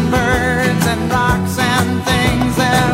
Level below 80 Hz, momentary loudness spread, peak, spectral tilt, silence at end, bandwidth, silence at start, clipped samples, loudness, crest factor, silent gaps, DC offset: -30 dBFS; 2 LU; 0 dBFS; -5 dB/octave; 0 s; 16.5 kHz; 0 s; under 0.1%; -15 LUFS; 14 dB; none; under 0.1%